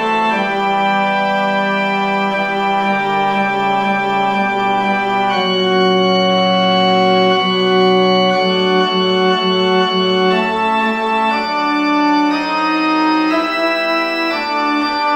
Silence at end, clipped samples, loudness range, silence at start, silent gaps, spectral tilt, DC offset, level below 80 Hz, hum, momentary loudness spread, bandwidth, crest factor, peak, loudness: 0 s; under 0.1%; 3 LU; 0 s; none; -5.5 dB/octave; under 0.1%; -56 dBFS; none; 4 LU; 15 kHz; 12 dB; -2 dBFS; -14 LUFS